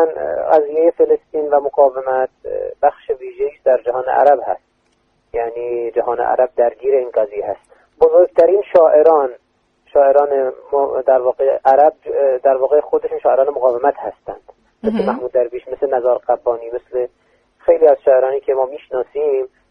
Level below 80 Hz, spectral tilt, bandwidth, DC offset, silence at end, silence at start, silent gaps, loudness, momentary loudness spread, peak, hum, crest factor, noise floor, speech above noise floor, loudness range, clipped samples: -54 dBFS; -8 dB/octave; 5.2 kHz; under 0.1%; 0.25 s; 0 s; none; -15 LUFS; 12 LU; 0 dBFS; none; 16 dB; -61 dBFS; 46 dB; 5 LU; under 0.1%